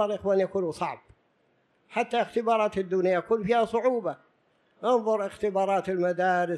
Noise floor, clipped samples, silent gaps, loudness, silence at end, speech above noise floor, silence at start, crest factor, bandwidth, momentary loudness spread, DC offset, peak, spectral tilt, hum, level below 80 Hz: -69 dBFS; under 0.1%; none; -27 LUFS; 0 s; 43 dB; 0 s; 16 dB; 11.5 kHz; 9 LU; under 0.1%; -12 dBFS; -6 dB/octave; none; -64 dBFS